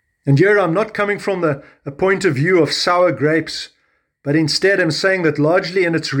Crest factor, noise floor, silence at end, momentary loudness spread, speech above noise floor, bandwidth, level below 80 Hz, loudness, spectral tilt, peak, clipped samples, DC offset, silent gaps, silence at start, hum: 14 dB; -60 dBFS; 0 s; 9 LU; 44 dB; 17.5 kHz; -56 dBFS; -16 LUFS; -5.5 dB/octave; -2 dBFS; under 0.1%; under 0.1%; none; 0.25 s; none